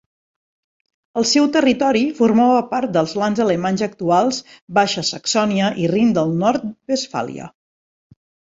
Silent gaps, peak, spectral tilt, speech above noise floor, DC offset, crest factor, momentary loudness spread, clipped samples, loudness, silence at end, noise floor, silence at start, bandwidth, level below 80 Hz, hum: 4.62-4.68 s; -2 dBFS; -4.5 dB/octave; over 73 dB; under 0.1%; 18 dB; 9 LU; under 0.1%; -18 LUFS; 1.05 s; under -90 dBFS; 1.15 s; 7.8 kHz; -58 dBFS; none